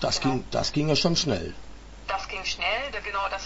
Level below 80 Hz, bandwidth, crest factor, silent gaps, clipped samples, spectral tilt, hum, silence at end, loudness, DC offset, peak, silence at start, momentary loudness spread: -44 dBFS; 8 kHz; 18 dB; none; under 0.1%; -4 dB/octave; none; 0 s; -26 LUFS; under 0.1%; -8 dBFS; 0 s; 10 LU